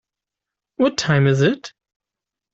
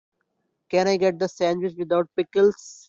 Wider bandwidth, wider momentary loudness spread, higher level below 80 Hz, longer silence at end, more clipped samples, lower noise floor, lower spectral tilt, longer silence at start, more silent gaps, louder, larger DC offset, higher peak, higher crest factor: about the same, 7.8 kHz vs 7.6 kHz; first, 13 LU vs 5 LU; first, -56 dBFS vs -66 dBFS; first, 0.85 s vs 0.15 s; neither; first, -87 dBFS vs -75 dBFS; about the same, -6 dB/octave vs -5.5 dB/octave; about the same, 0.8 s vs 0.7 s; neither; first, -18 LUFS vs -23 LUFS; neither; first, -4 dBFS vs -8 dBFS; about the same, 18 dB vs 16 dB